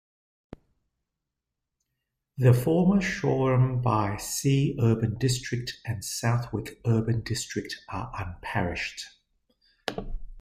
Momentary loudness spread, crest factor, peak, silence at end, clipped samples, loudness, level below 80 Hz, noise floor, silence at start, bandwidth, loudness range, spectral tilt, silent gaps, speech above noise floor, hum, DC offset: 13 LU; 20 dB; -8 dBFS; 0 s; under 0.1%; -27 LUFS; -48 dBFS; -85 dBFS; 0.5 s; 16 kHz; 7 LU; -6 dB/octave; none; 60 dB; none; under 0.1%